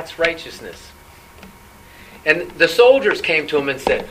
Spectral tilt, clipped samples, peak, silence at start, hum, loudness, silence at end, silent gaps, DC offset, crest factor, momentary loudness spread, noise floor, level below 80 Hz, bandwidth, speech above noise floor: -3.5 dB/octave; under 0.1%; 0 dBFS; 0 s; none; -16 LUFS; 0 s; none; under 0.1%; 18 dB; 19 LU; -43 dBFS; -48 dBFS; 15.5 kHz; 26 dB